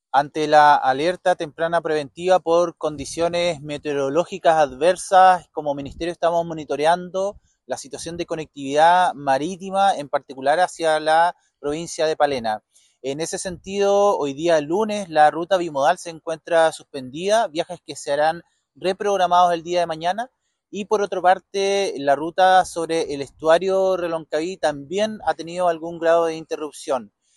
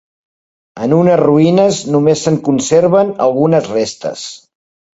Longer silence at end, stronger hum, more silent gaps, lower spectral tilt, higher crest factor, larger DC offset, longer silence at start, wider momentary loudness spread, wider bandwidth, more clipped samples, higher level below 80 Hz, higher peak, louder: second, 0.3 s vs 0.6 s; neither; neither; second, -4 dB/octave vs -6 dB/octave; first, 18 dB vs 12 dB; neither; second, 0.15 s vs 0.75 s; about the same, 13 LU vs 12 LU; first, 12 kHz vs 8 kHz; neither; about the same, -56 dBFS vs -52 dBFS; about the same, -2 dBFS vs 0 dBFS; second, -20 LUFS vs -12 LUFS